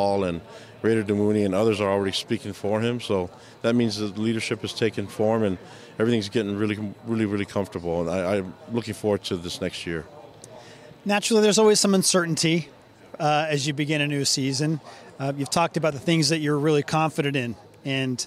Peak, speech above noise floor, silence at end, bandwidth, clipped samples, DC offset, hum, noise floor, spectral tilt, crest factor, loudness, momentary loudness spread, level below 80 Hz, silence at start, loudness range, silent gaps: -8 dBFS; 22 dB; 0 s; 15.5 kHz; under 0.1%; under 0.1%; none; -45 dBFS; -4.5 dB/octave; 16 dB; -24 LUFS; 11 LU; -62 dBFS; 0 s; 6 LU; none